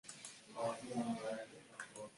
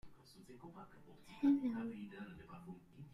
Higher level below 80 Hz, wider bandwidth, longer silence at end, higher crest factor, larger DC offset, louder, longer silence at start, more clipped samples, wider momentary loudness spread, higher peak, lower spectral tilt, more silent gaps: second, -82 dBFS vs -72 dBFS; about the same, 11.5 kHz vs 11.5 kHz; about the same, 0 s vs 0 s; about the same, 16 dB vs 18 dB; neither; second, -45 LUFS vs -39 LUFS; about the same, 0.05 s vs 0.05 s; neither; second, 11 LU vs 25 LU; second, -28 dBFS vs -24 dBFS; second, -4.5 dB/octave vs -7.5 dB/octave; neither